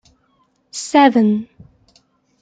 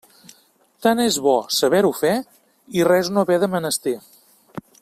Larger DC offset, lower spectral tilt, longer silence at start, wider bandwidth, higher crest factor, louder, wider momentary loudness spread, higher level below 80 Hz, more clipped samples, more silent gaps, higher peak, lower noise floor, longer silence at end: neither; about the same, -5 dB/octave vs -4 dB/octave; about the same, 0.75 s vs 0.8 s; second, 9.4 kHz vs 16 kHz; about the same, 16 dB vs 18 dB; first, -14 LUFS vs -19 LUFS; first, 20 LU vs 12 LU; about the same, -62 dBFS vs -62 dBFS; neither; neither; about the same, -2 dBFS vs -4 dBFS; about the same, -61 dBFS vs -58 dBFS; first, 0.95 s vs 0.2 s